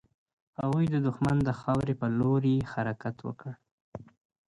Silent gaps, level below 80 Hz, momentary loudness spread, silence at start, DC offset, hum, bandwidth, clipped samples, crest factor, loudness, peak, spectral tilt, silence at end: 3.71-3.92 s; -54 dBFS; 20 LU; 0.6 s; under 0.1%; none; 11 kHz; under 0.1%; 14 dB; -29 LUFS; -16 dBFS; -9 dB/octave; 0.45 s